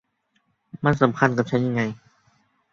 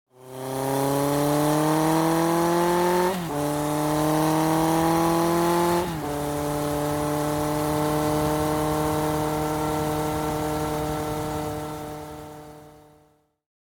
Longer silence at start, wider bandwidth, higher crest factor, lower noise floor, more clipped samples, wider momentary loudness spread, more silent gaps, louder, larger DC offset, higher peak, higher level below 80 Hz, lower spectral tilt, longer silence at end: first, 0.75 s vs 0.2 s; second, 7.4 kHz vs over 20 kHz; first, 22 dB vs 16 dB; first, -70 dBFS vs -61 dBFS; neither; about the same, 9 LU vs 9 LU; neither; about the same, -22 LUFS vs -24 LUFS; neither; first, -2 dBFS vs -8 dBFS; second, -56 dBFS vs -46 dBFS; first, -7.5 dB/octave vs -5.5 dB/octave; second, 0.75 s vs 1.05 s